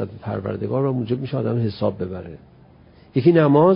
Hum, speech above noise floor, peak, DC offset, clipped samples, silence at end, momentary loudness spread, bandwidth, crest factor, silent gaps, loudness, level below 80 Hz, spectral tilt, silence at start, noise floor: none; 29 dB; -4 dBFS; under 0.1%; under 0.1%; 0 s; 15 LU; 5.4 kHz; 16 dB; none; -21 LUFS; -50 dBFS; -13 dB/octave; 0 s; -49 dBFS